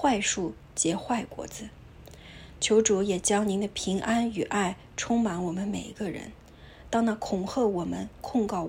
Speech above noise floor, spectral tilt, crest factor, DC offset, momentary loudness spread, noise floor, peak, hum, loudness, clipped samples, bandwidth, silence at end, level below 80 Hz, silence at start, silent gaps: 21 dB; -4 dB/octave; 20 dB; under 0.1%; 15 LU; -49 dBFS; -10 dBFS; none; -28 LUFS; under 0.1%; 16 kHz; 0 s; -52 dBFS; 0 s; none